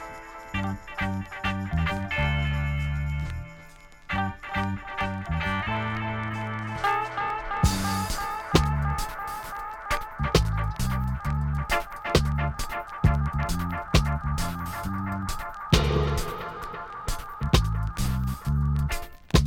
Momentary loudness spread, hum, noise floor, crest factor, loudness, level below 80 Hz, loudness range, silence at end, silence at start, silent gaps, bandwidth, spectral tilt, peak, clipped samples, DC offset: 10 LU; none; -48 dBFS; 22 dB; -28 LUFS; -32 dBFS; 3 LU; 0 s; 0 s; none; 17.5 kHz; -5.5 dB/octave; -4 dBFS; under 0.1%; under 0.1%